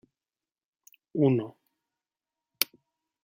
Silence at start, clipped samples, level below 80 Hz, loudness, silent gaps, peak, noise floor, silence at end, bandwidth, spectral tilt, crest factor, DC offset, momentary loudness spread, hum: 1.15 s; under 0.1%; -78 dBFS; -28 LUFS; none; 0 dBFS; under -90 dBFS; 0.6 s; 16.5 kHz; -5.5 dB/octave; 32 dB; under 0.1%; 12 LU; none